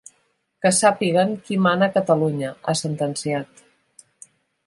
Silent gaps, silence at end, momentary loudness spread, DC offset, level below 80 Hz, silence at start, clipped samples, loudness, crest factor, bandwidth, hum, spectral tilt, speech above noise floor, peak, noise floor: none; 1.25 s; 9 LU; under 0.1%; -66 dBFS; 0.6 s; under 0.1%; -20 LUFS; 18 dB; 11.5 kHz; none; -4.5 dB/octave; 47 dB; -4 dBFS; -67 dBFS